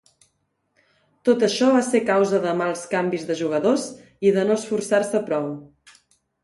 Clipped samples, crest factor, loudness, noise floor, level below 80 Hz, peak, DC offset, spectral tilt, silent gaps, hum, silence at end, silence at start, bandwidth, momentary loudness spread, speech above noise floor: under 0.1%; 16 dB; -21 LUFS; -71 dBFS; -68 dBFS; -6 dBFS; under 0.1%; -5 dB/octave; none; none; 0.8 s; 1.25 s; 11.5 kHz; 7 LU; 51 dB